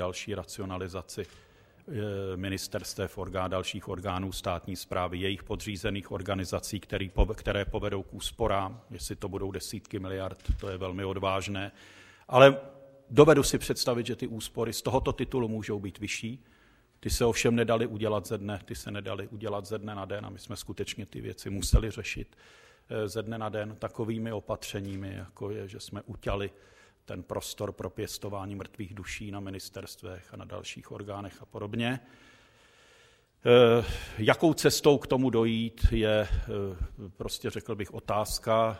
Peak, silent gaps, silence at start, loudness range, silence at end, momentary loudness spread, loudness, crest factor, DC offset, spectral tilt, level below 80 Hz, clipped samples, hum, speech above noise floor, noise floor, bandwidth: -2 dBFS; none; 0 s; 13 LU; 0 s; 16 LU; -30 LUFS; 28 dB; under 0.1%; -5 dB/octave; -42 dBFS; under 0.1%; none; 32 dB; -62 dBFS; 16 kHz